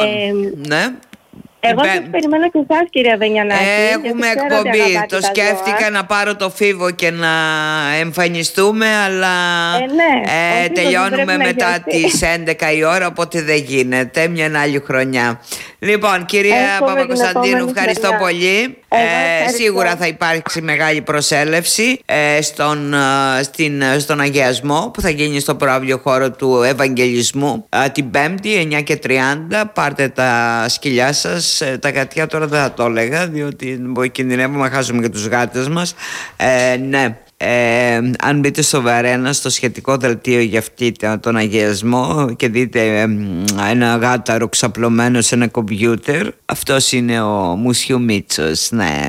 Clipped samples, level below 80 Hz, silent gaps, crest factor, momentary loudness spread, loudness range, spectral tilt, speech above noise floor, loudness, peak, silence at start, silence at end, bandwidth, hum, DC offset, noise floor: under 0.1%; -46 dBFS; none; 12 dB; 5 LU; 2 LU; -4 dB/octave; 25 dB; -14 LUFS; -2 dBFS; 0 s; 0 s; 16.5 kHz; none; under 0.1%; -40 dBFS